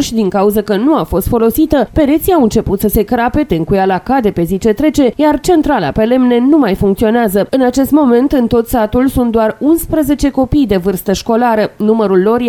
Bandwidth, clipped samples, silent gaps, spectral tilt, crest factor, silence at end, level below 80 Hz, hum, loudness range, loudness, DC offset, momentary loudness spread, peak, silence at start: 20 kHz; under 0.1%; none; -6 dB/octave; 10 dB; 0 s; -30 dBFS; none; 2 LU; -11 LUFS; under 0.1%; 3 LU; 0 dBFS; 0 s